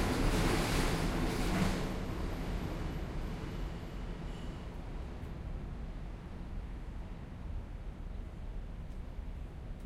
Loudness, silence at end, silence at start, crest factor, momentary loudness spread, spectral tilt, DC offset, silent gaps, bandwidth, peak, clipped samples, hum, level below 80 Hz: -39 LUFS; 0 s; 0 s; 18 dB; 14 LU; -5.5 dB/octave; under 0.1%; none; 16 kHz; -20 dBFS; under 0.1%; none; -40 dBFS